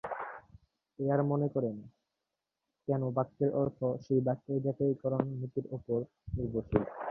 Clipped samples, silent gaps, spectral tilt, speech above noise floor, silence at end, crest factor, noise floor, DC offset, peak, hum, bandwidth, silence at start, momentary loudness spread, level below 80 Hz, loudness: under 0.1%; none; -11.5 dB/octave; 55 dB; 0 s; 22 dB; -88 dBFS; under 0.1%; -12 dBFS; none; 6 kHz; 0.05 s; 10 LU; -56 dBFS; -34 LUFS